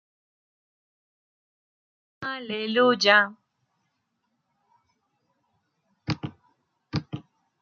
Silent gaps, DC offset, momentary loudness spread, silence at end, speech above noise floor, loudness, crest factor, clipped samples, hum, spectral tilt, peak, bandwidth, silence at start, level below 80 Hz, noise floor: none; under 0.1%; 22 LU; 0.4 s; 55 dB; -24 LUFS; 26 dB; under 0.1%; none; -4.5 dB/octave; -4 dBFS; 7.4 kHz; 2.2 s; -66 dBFS; -77 dBFS